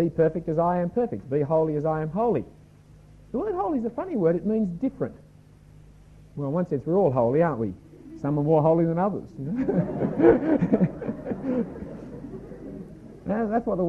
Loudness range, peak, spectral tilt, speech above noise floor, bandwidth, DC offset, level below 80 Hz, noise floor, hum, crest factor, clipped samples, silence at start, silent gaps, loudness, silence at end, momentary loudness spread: 5 LU; -4 dBFS; -11 dB/octave; 27 dB; 6.2 kHz; under 0.1%; -52 dBFS; -51 dBFS; none; 20 dB; under 0.1%; 0 s; none; -25 LUFS; 0 s; 18 LU